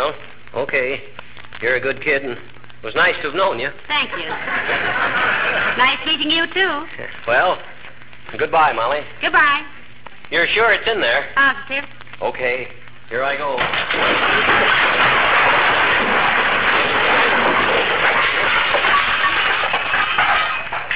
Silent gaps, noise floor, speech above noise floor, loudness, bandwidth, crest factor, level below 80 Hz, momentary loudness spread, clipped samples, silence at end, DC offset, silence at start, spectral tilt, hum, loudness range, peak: none; -41 dBFS; 22 dB; -16 LUFS; 4 kHz; 14 dB; -48 dBFS; 12 LU; under 0.1%; 0 s; 2%; 0 s; -6.5 dB/octave; none; 6 LU; -4 dBFS